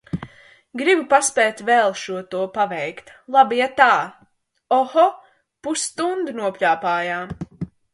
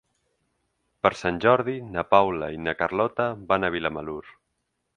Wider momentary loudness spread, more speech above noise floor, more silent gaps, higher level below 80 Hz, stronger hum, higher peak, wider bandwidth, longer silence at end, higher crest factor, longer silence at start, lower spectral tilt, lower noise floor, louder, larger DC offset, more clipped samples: first, 16 LU vs 10 LU; second, 24 dB vs 53 dB; neither; about the same, -56 dBFS vs -54 dBFS; neither; about the same, 0 dBFS vs -2 dBFS; first, 11.5 kHz vs 9.8 kHz; second, 0.25 s vs 0.65 s; about the same, 20 dB vs 24 dB; second, 0.15 s vs 1.05 s; second, -3 dB/octave vs -6.5 dB/octave; second, -43 dBFS vs -77 dBFS; first, -19 LUFS vs -24 LUFS; neither; neither